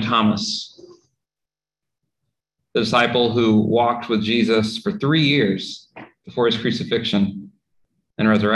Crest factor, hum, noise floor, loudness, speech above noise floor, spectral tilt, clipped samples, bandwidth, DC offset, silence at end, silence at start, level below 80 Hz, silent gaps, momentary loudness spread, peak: 18 dB; none; -88 dBFS; -19 LUFS; 70 dB; -5.5 dB/octave; under 0.1%; 11 kHz; under 0.1%; 0 s; 0 s; -54 dBFS; none; 12 LU; -2 dBFS